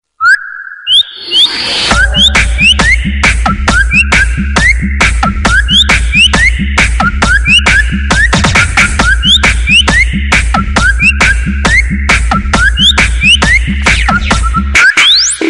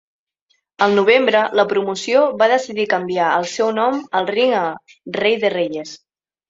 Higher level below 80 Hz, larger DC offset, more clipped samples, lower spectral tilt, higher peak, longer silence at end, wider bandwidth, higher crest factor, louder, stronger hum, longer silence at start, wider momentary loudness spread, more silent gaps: first, -14 dBFS vs -64 dBFS; neither; neither; about the same, -3 dB/octave vs -4 dB/octave; about the same, 0 dBFS vs 0 dBFS; second, 0 s vs 0.55 s; first, 11.5 kHz vs 8 kHz; second, 8 dB vs 18 dB; first, -6 LUFS vs -17 LUFS; neither; second, 0.2 s vs 0.8 s; second, 5 LU vs 10 LU; neither